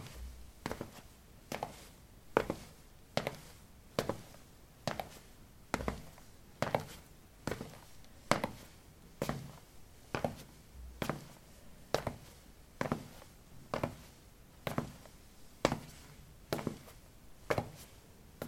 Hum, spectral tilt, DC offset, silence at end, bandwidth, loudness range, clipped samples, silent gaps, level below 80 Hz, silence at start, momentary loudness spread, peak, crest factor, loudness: none; -5 dB/octave; under 0.1%; 0 s; 16.5 kHz; 3 LU; under 0.1%; none; -58 dBFS; 0 s; 22 LU; -6 dBFS; 36 dB; -41 LUFS